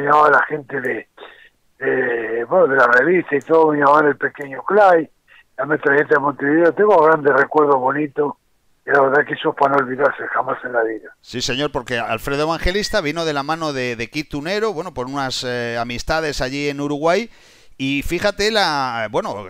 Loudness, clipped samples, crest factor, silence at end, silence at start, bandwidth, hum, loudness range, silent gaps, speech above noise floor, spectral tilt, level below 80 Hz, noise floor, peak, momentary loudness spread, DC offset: -18 LUFS; under 0.1%; 16 dB; 0 s; 0 s; 16 kHz; none; 7 LU; none; 32 dB; -4.5 dB/octave; -40 dBFS; -49 dBFS; 0 dBFS; 11 LU; under 0.1%